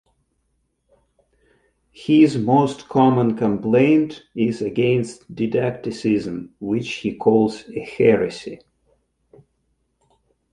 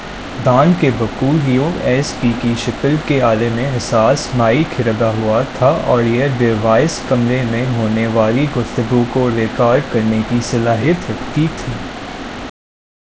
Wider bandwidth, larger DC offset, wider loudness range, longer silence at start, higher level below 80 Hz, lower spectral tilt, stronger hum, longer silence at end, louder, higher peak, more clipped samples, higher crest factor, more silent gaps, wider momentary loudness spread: first, 10.5 kHz vs 8 kHz; second, under 0.1% vs 0.4%; about the same, 4 LU vs 2 LU; first, 2 s vs 0 s; second, -58 dBFS vs -36 dBFS; about the same, -7.5 dB/octave vs -6.5 dB/octave; neither; first, 1.95 s vs 0.6 s; second, -19 LUFS vs -15 LUFS; about the same, -2 dBFS vs 0 dBFS; neither; about the same, 18 dB vs 14 dB; neither; first, 15 LU vs 6 LU